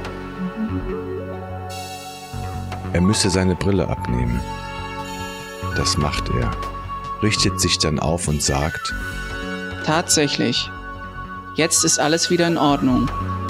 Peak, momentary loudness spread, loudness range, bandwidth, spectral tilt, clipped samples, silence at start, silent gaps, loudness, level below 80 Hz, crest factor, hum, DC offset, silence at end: -4 dBFS; 14 LU; 5 LU; 16 kHz; -4 dB/octave; under 0.1%; 0 s; none; -21 LUFS; -34 dBFS; 18 dB; none; under 0.1%; 0 s